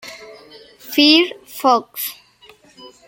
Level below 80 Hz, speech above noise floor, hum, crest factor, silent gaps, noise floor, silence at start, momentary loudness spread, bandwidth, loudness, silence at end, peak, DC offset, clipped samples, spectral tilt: -66 dBFS; 33 dB; none; 20 dB; none; -49 dBFS; 0.05 s; 19 LU; 17 kHz; -16 LUFS; 0.2 s; 0 dBFS; under 0.1%; under 0.1%; -1.5 dB/octave